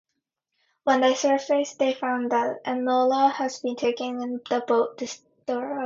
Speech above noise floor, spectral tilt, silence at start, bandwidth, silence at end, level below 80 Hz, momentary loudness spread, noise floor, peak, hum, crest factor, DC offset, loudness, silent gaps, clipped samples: 57 dB; -3 dB/octave; 0.85 s; 7.6 kHz; 0 s; -74 dBFS; 9 LU; -81 dBFS; -8 dBFS; none; 18 dB; under 0.1%; -24 LUFS; none; under 0.1%